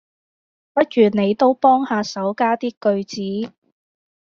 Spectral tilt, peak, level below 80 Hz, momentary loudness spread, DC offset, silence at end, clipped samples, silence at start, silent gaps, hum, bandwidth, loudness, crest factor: -4.5 dB/octave; -2 dBFS; -64 dBFS; 10 LU; under 0.1%; 0.75 s; under 0.1%; 0.75 s; 2.77-2.81 s; none; 7.4 kHz; -19 LUFS; 18 dB